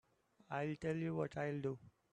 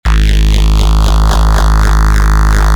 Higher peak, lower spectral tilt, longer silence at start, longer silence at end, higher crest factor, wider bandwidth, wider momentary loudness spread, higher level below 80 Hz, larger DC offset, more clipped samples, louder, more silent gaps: second, -26 dBFS vs 0 dBFS; first, -8 dB/octave vs -5 dB/octave; first, 0.5 s vs 0.05 s; first, 0.25 s vs 0 s; first, 16 dB vs 8 dB; second, 9.6 kHz vs 14 kHz; first, 6 LU vs 0 LU; second, -74 dBFS vs -8 dBFS; neither; neither; second, -42 LUFS vs -11 LUFS; neither